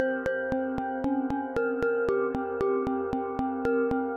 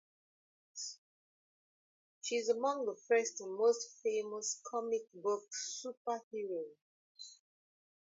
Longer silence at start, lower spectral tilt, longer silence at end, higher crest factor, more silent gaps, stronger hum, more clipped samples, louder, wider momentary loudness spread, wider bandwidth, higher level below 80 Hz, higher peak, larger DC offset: second, 0 s vs 0.75 s; first, -8 dB/octave vs -1 dB/octave; second, 0 s vs 0.85 s; about the same, 16 dB vs 20 dB; second, none vs 0.98-2.21 s, 5.97-6.05 s, 6.23-6.31 s, 6.82-7.15 s; neither; neither; first, -29 LUFS vs -38 LUFS; second, 4 LU vs 18 LU; about the same, 7.6 kHz vs 7.6 kHz; first, -52 dBFS vs under -90 dBFS; first, -12 dBFS vs -20 dBFS; neither